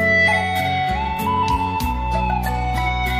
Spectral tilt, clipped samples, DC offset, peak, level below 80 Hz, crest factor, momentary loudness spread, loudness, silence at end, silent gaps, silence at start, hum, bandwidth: -5 dB/octave; under 0.1%; under 0.1%; -6 dBFS; -28 dBFS; 12 dB; 7 LU; -19 LUFS; 0 s; none; 0 s; none; 15.5 kHz